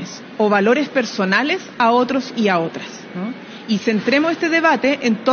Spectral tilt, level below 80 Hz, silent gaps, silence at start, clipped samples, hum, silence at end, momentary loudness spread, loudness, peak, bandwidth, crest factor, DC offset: -3 dB/octave; -66 dBFS; none; 0 s; under 0.1%; none; 0 s; 13 LU; -17 LUFS; 0 dBFS; 6.8 kHz; 16 dB; under 0.1%